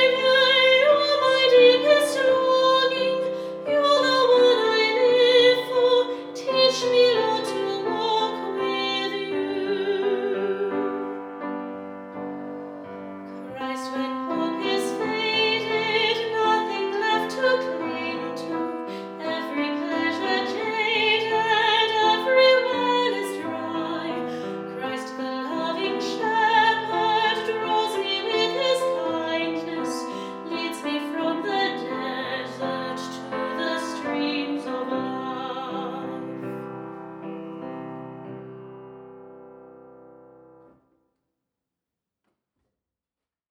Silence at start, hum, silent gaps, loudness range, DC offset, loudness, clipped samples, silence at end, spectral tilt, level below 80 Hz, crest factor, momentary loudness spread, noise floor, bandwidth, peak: 0 s; none; none; 13 LU; under 0.1%; -23 LUFS; under 0.1%; 3.6 s; -3.5 dB/octave; -74 dBFS; 18 dB; 16 LU; under -90 dBFS; 13.5 kHz; -6 dBFS